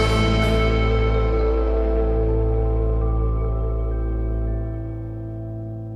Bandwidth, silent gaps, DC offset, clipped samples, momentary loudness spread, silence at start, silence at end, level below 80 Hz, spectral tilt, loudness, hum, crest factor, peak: 10 kHz; none; under 0.1%; under 0.1%; 12 LU; 0 s; 0 s; -22 dBFS; -7 dB/octave; -23 LUFS; none; 12 dB; -8 dBFS